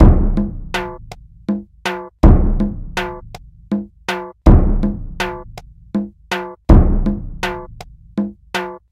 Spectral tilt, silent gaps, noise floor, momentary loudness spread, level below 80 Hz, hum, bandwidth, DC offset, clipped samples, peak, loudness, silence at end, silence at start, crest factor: -7.5 dB/octave; none; -37 dBFS; 19 LU; -18 dBFS; none; 11 kHz; under 0.1%; 0.3%; 0 dBFS; -19 LUFS; 0.15 s; 0 s; 16 dB